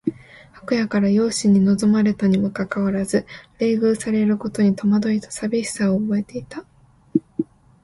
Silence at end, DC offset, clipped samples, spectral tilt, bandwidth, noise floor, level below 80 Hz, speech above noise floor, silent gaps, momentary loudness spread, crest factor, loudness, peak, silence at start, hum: 0.4 s; under 0.1%; under 0.1%; -6.5 dB/octave; 11.5 kHz; -45 dBFS; -54 dBFS; 26 dB; none; 12 LU; 16 dB; -20 LUFS; -4 dBFS; 0.05 s; none